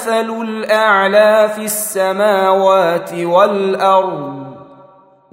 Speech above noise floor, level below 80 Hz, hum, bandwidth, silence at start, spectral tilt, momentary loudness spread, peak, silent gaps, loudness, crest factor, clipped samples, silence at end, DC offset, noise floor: 32 dB; -66 dBFS; none; 16.5 kHz; 0 s; -3.5 dB/octave; 11 LU; 0 dBFS; none; -13 LUFS; 14 dB; under 0.1%; 0.7 s; under 0.1%; -45 dBFS